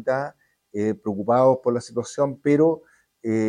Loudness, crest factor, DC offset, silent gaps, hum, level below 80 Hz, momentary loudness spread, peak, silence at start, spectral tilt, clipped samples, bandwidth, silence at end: -22 LUFS; 16 dB; under 0.1%; none; none; -66 dBFS; 14 LU; -6 dBFS; 0 s; -7 dB/octave; under 0.1%; 10.5 kHz; 0 s